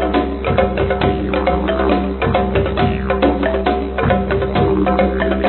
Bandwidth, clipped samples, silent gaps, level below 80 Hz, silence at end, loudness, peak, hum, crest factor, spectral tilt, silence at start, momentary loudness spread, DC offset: 4.4 kHz; under 0.1%; none; -26 dBFS; 0 s; -16 LUFS; 0 dBFS; none; 16 dB; -11 dB/octave; 0 s; 2 LU; under 0.1%